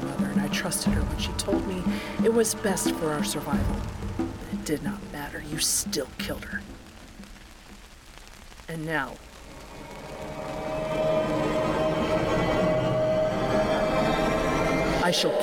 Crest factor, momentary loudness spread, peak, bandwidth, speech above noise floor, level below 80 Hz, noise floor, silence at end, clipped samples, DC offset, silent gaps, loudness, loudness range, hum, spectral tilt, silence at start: 14 dB; 21 LU; -12 dBFS; 19 kHz; 20 dB; -40 dBFS; -47 dBFS; 0 s; under 0.1%; under 0.1%; none; -27 LUFS; 12 LU; none; -4.5 dB/octave; 0 s